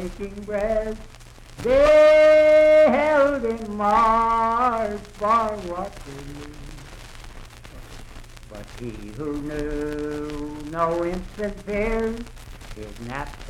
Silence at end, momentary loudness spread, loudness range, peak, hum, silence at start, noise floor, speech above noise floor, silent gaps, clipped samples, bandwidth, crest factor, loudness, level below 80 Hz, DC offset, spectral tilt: 0 s; 26 LU; 20 LU; -6 dBFS; none; 0 s; -41 dBFS; 20 dB; none; under 0.1%; 12.5 kHz; 16 dB; -20 LUFS; -40 dBFS; under 0.1%; -5.5 dB/octave